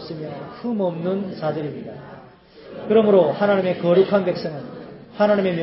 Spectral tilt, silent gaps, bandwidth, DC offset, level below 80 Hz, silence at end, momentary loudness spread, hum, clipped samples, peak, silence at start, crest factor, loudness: -11.5 dB/octave; none; 5.8 kHz; under 0.1%; -62 dBFS; 0 s; 20 LU; none; under 0.1%; -4 dBFS; 0 s; 16 dB; -20 LUFS